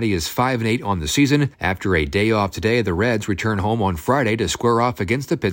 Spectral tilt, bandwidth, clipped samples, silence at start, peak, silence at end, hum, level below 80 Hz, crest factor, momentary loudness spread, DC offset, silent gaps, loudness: -5.5 dB/octave; 16.5 kHz; under 0.1%; 0 s; -4 dBFS; 0 s; none; -40 dBFS; 16 dB; 4 LU; under 0.1%; none; -20 LUFS